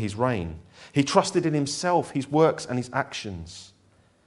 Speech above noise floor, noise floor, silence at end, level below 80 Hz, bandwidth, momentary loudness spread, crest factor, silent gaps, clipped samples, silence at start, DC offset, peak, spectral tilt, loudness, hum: 35 dB; -61 dBFS; 0.6 s; -54 dBFS; 11.5 kHz; 16 LU; 22 dB; none; under 0.1%; 0 s; under 0.1%; -4 dBFS; -5 dB/octave; -25 LUFS; none